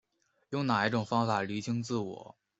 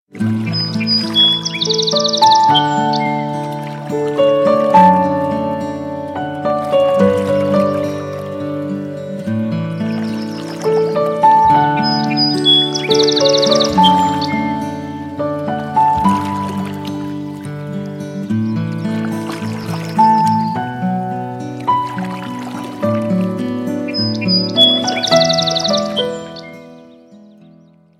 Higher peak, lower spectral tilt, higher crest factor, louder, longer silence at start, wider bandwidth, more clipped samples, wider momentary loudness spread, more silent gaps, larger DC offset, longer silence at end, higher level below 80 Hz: second, -12 dBFS vs 0 dBFS; first, -6 dB/octave vs -4.5 dB/octave; first, 20 dB vs 14 dB; second, -32 LUFS vs -15 LUFS; first, 0.5 s vs 0.15 s; second, 8.2 kHz vs 15 kHz; neither; second, 10 LU vs 14 LU; neither; neither; second, 0.3 s vs 0.8 s; second, -70 dBFS vs -52 dBFS